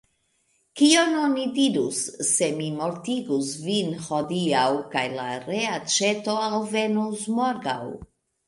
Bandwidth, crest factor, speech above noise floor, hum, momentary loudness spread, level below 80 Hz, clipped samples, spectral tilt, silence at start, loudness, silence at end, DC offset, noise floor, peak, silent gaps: 11.5 kHz; 20 dB; 45 dB; none; 8 LU; -64 dBFS; under 0.1%; -3.5 dB/octave; 0.75 s; -24 LUFS; 0.4 s; under 0.1%; -69 dBFS; -4 dBFS; none